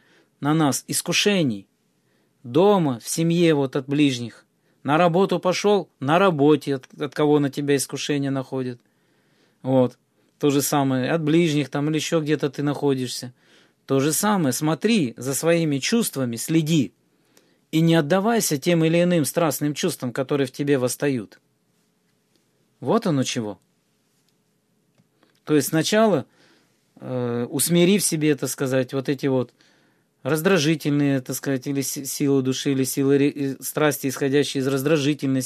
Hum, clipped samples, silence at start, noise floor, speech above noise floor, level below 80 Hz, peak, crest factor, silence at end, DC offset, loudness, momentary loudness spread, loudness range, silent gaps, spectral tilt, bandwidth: none; under 0.1%; 0.4 s; -67 dBFS; 46 dB; -70 dBFS; -2 dBFS; 20 dB; 0 s; under 0.1%; -21 LUFS; 8 LU; 5 LU; none; -5 dB/octave; 15 kHz